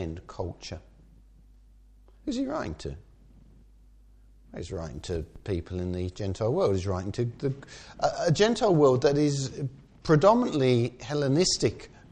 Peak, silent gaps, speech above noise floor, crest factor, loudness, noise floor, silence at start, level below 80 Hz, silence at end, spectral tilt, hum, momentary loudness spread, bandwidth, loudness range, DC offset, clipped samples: -6 dBFS; none; 29 dB; 22 dB; -27 LUFS; -55 dBFS; 0 s; -50 dBFS; 0.25 s; -5.5 dB/octave; none; 18 LU; 10 kHz; 14 LU; under 0.1%; under 0.1%